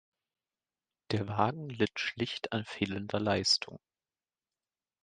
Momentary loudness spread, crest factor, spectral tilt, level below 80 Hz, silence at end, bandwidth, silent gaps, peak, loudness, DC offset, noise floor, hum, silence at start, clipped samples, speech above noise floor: 8 LU; 24 dB; -4 dB/octave; -62 dBFS; 1.25 s; 9.4 kHz; none; -12 dBFS; -32 LUFS; under 0.1%; under -90 dBFS; none; 1.1 s; under 0.1%; over 57 dB